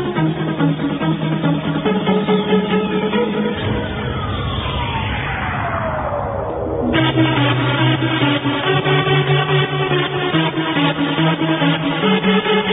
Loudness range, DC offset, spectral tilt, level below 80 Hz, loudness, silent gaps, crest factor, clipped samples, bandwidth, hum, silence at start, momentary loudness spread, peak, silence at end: 5 LU; under 0.1%; -10 dB/octave; -36 dBFS; -17 LUFS; none; 16 dB; under 0.1%; 4 kHz; none; 0 s; 6 LU; -2 dBFS; 0 s